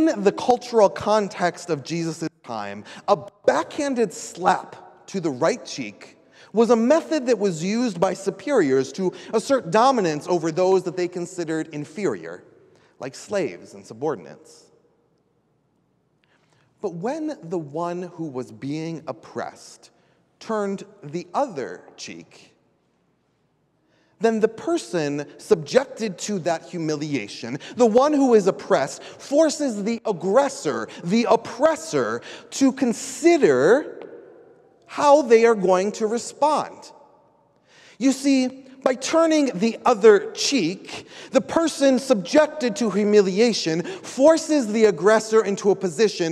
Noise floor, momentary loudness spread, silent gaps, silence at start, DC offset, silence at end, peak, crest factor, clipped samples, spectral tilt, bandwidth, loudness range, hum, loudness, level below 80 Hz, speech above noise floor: -67 dBFS; 15 LU; none; 0 s; under 0.1%; 0 s; -2 dBFS; 18 dB; under 0.1%; -5 dB/octave; 13 kHz; 12 LU; none; -21 LUFS; -68 dBFS; 46 dB